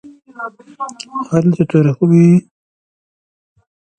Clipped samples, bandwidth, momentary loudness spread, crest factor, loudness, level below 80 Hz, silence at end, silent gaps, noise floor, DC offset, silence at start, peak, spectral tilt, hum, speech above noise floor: under 0.1%; 8.8 kHz; 19 LU; 16 dB; -13 LUFS; -54 dBFS; 1.6 s; none; under -90 dBFS; under 0.1%; 0.05 s; 0 dBFS; -8.5 dB/octave; none; over 77 dB